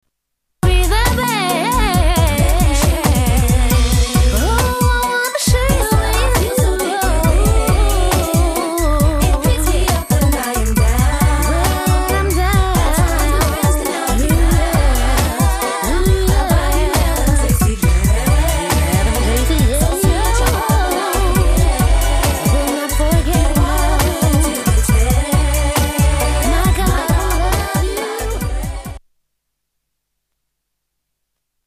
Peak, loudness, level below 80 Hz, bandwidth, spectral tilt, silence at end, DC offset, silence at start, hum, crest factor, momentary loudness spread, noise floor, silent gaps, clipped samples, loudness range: 0 dBFS; -15 LUFS; -16 dBFS; 15.5 kHz; -5 dB/octave; 2.7 s; under 0.1%; 0.65 s; none; 12 dB; 3 LU; -75 dBFS; none; under 0.1%; 2 LU